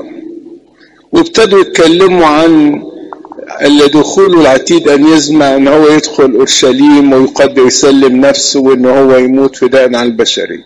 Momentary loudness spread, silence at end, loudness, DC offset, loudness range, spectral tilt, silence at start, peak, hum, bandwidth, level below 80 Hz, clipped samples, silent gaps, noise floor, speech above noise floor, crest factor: 6 LU; 0.05 s; -6 LUFS; under 0.1%; 2 LU; -4 dB/octave; 0 s; 0 dBFS; none; 11.5 kHz; -42 dBFS; 0.3%; none; -42 dBFS; 37 dB; 6 dB